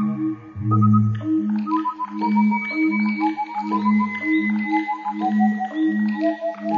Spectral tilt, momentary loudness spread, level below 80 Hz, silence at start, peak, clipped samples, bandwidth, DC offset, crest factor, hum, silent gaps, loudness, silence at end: -9 dB/octave; 7 LU; -66 dBFS; 0 s; -6 dBFS; under 0.1%; 5.2 kHz; under 0.1%; 14 dB; none; none; -21 LUFS; 0 s